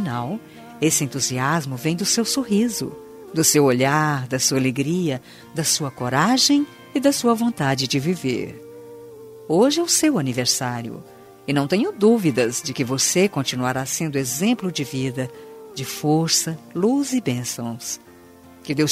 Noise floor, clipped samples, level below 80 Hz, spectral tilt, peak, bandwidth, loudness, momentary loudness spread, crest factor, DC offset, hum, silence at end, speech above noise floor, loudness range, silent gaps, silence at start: -46 dBFS; under 0.1%; -60 dBFS; -4 dB/octave; -2 dBFS; 16 kHz; -20 LUFS; 15 LU; 18 dB; under 0.1%; none; 0 s; 25 dB; 3 LU; none; 0 s